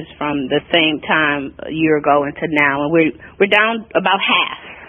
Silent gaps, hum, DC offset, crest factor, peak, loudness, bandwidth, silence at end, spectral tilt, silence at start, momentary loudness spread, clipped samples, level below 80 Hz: none; none; under 0.1%; 16 dB; 0 dBFS; -16 LUFS; 3.9 kHz; 0.05 s; -7 dB/octave; 0 s; 7 LU; under 0.1%; -50 dBFS